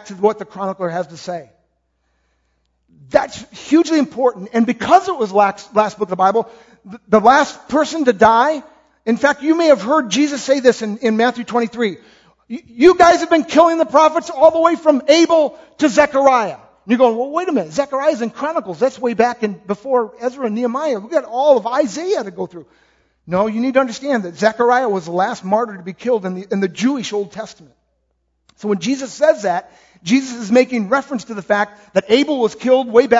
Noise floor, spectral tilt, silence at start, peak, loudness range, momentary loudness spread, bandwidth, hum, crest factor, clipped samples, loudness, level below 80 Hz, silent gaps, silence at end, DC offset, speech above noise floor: -67 dBFS; -4.5 dB/octave; 0.05 s; 0 dBFS; 7 LU; 13 LU; 8 kHz; none; 16 dB; under 0.1%; -16 LUFS; -56 dBFS; none; 0 s; under 0.1%; 51 dB